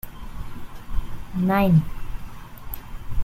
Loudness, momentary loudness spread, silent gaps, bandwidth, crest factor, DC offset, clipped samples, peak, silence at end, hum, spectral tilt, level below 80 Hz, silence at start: -22 LUFS; 22 LU; none; 16.5 kHz; 18 dB; under 0.1%; under 0.1%; -6 dBFS; 0 s; none; -8.5 dB/octave; -34 dBFS; 0.05 s